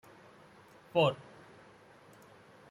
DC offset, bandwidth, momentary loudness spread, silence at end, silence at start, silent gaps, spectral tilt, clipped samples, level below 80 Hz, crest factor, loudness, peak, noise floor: under 0.1%; 14.5 kHz; 28 LU; 1.5 s; 0.95 s; none; -6.5 dB/octave; under 0.1%; -74 dBFS; 22 dB; -31 LUFS; -16 dBFS; -58 dBFS